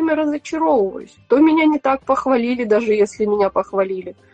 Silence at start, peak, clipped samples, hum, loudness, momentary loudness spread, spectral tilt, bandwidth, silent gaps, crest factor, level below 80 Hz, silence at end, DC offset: 0 s; -4 dBFS; under 0.1%; none; -17 LUFS; 8 LU; -6 dB/octave; 8.8 kHz; none; 14 dB; -54 dBFS; 0.2 s; under 0.1%